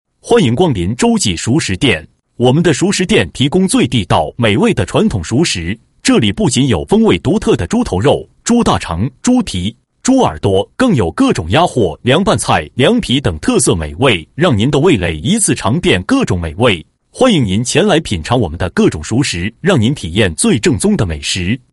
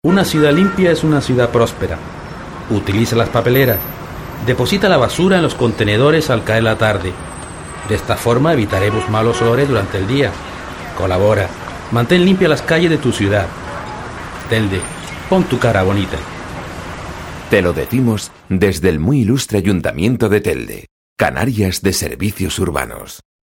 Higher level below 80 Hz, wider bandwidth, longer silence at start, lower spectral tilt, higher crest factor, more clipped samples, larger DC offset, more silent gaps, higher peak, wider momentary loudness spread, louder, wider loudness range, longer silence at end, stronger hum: about the same, -34 dBFS vs -36 dBFS; second, 11.5 kHz vs 17 kHz; first, 0.25 s vs 0.05 s; about the same, -5 dB/octave vs -6 dB/octave; about the same, 12 dB vs 16 dB; neither; neither; second, none vs 20.91-21.16 s; about the same, 0 dBFS vs 0 dBFS; second, 4 LU vs 15 LU; about the same, -13 LUFS vs -15 LUFS; second, 1 LU vs 4 LU; about the same, 0.15 s vs 0.25 s; neither